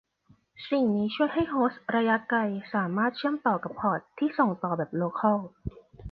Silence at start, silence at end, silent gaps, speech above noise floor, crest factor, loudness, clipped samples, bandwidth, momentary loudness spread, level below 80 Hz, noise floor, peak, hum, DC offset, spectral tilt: 0.6 s; 0 s; none; 36 dB; 18 dB; -28 LUFS; under 0.1%; 5.4 kHz; 5 LU; -56 dBFS; -64 dBFS; -10 dBFS; none; under 0.1%; -9.5 dB/octave